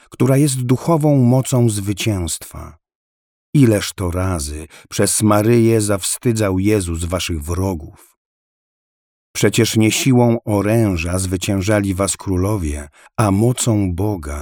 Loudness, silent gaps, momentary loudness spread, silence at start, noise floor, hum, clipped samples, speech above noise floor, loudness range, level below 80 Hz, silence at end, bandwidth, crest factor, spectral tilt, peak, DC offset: -17 LUFS; 2.95-3.53 s, 8.17-9.34 s; 10 LU; 0.1 s; under -90 dBFS; none; under 0.1%; over 74 dB; 4 LU; -36 dBFS; 0 s; 19 kHz; 16 dB; -5.5 dB/octave; -2 dBFS; under 0.1%